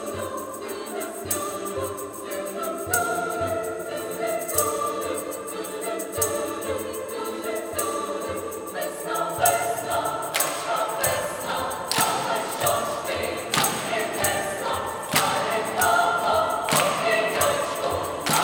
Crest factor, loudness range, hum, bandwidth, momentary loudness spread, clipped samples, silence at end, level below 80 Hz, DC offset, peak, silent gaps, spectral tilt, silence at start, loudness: 22 dB; 6 LU; none; over 20 kHz; 10 LU; under 0.1%; 0 s; -60 dBFS; under 0.1%; -4 dBFS; none; -2.5 dB/octave; 0 s; -25 LUFS